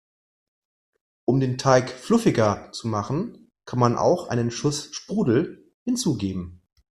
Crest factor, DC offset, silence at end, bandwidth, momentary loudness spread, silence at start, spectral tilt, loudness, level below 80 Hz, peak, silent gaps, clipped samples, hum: 22 dB; under 0.1%; 0.35 s; 13 kHz; 11 LU; 1.3 s; -6 dB/octave; -23 LUFS; -56 dBFS; -2 dBFS; 5.74-5.86 s; under 0.1%; none